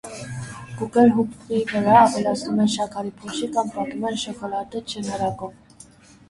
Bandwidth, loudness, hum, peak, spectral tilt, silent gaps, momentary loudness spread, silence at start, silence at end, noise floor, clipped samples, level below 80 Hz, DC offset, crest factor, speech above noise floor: 11.5 kHz; -22 LUFS; none; -2 dBFS; -5 dB/octave; none; 17 LU; 0.05 s; 0.75 s; -48 dBFS; under 0.1%; -56 dBFS; under 0.1%; 20 dB; 27 dB